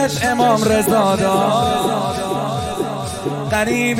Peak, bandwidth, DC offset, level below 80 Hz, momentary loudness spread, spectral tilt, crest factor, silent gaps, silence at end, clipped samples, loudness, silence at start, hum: -2 dBFS; 16.5 kHz; under 0.1%; -42 dBFS; 8 LU; -4.5 dB/octave; 16 dB; none; 0 s; under 0.1%; -17 LUFS; 0 s; none